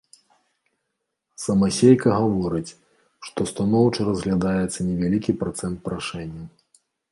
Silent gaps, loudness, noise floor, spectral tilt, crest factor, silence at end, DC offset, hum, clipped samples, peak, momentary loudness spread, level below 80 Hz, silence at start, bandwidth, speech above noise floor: none; -22 LUFS; -79 dBFS; -6.5 dB/octave; 20 dB; 0.65 s; under 0.1%; none; under 0.1%; -2 dBFS; 18 LU; -48 dBFS; 1.4 s; 11.5 kHz; 57 dB